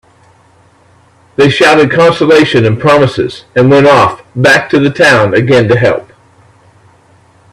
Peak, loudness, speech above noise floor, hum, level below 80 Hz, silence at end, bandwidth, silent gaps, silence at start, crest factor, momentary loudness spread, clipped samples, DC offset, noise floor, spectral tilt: 0 dBFS; -7 LUFS; 38 dB; none; -44 dBFS; 1.5 s; 13.5 kHz; none; 1.4 s; 10 dB; 7 LU; 0.2%; under 0.1%; -45 dBFS; -6 dB/octave